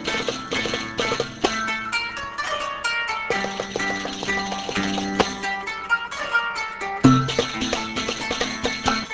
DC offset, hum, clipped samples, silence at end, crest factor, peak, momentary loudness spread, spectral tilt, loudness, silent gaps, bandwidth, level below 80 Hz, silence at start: under 0.1%; none; under 0.1%; 0 s; 24 dB; 0 dBFS; 6 LU; -4 dB/octave; -23 LUFS; none; 8 kHz; -46 dBFS; 0 s